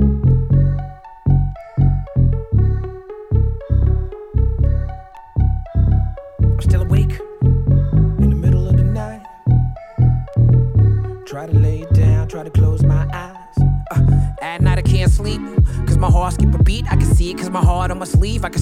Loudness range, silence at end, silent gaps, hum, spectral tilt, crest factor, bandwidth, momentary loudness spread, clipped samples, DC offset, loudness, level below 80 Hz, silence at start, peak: 3 LU; 0 s; none; none; -8 dB/octave; 14 dB; 11.5 kHz; 9 LU; under 0.1%; under 0.1%; -17 LUFS; -20 dBFS; 0 s; -2 dBFS